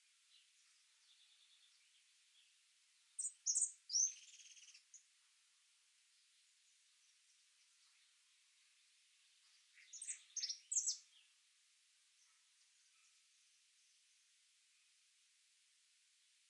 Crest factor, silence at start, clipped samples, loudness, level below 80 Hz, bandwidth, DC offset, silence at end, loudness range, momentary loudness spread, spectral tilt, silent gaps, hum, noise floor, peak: 28 dB; 3.2 s; under 0.1%; -41 LUFS; under -90 dBFS; 11 kHz; under 0.1%; 5.5 s; 15 LU; 22 LU; 8.5 dB/octave; none; none; -76 dBFS; -24 dBFS